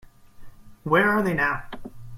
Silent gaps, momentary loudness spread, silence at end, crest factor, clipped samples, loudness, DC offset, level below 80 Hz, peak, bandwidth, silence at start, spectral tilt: none; 21 LU; 0 s; 20 dB; under 0.1%; -22 LUFS; under 0.1%; -48 dBFS; -6 dBFS; 16.5 kHz; 0.25 s; -6.5 dB/octave